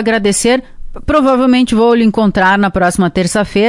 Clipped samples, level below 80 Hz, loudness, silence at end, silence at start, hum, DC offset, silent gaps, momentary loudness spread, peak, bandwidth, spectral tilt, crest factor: under 0.1%; -32 dBFS; -11 LUFS; 0 s; 0 s; none; under 0.1%; none; 4 LU; 0 dBFS; 11.5 kHz; -5 dB/octave; 10 dB